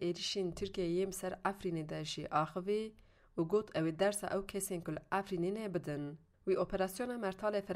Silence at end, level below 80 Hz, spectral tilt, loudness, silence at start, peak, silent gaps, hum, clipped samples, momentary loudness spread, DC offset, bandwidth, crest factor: 0 s; -62 dBFS; -5 dB/octave; -38 LUFS; 0 s; -18 dBFS; none; none; under 0.1%; 7 LU; under 0.1%; 15.5 kHz; 18 dB